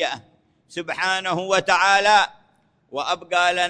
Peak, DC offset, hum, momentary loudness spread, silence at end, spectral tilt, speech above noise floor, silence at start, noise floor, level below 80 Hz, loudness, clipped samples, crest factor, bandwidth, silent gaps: -4 dBFS; under 0.1%; none; 17 LU; 0 s; -2 dB/octave; 41 dB; 0 s; -61 dBFS; -64 dBFS; -20 LUFS; under 0.1%; 16 dB; 10.5 kHz; none